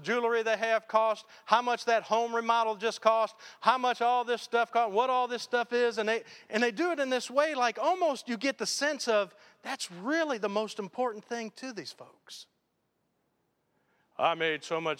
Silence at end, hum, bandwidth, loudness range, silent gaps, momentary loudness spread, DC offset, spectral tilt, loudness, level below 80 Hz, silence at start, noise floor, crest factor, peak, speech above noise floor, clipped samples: 0.05 s; none; 15.5 kHz; 9 LU; none; 11 LU; under 0.1%; -3 dB/octave; -29 LUFS; -88 dBFS; 0 s; -78 dBFS; 24 dB; -6 dBFS; 48 dB; under 0.1%